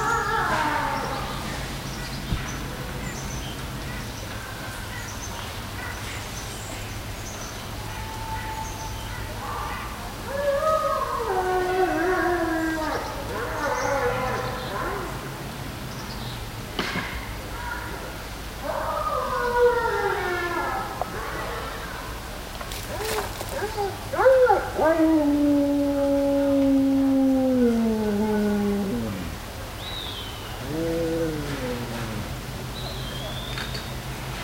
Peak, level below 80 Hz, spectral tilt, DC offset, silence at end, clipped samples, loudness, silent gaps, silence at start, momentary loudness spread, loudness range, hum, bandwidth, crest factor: -8 dBFS; -40 dBFS; -5 dB/octave; under 0.1%; 0 s; under 0.1%; -26 LUFS; none; 0 s; 13 LU; 11 LU; none; 16 kHz; 18 dB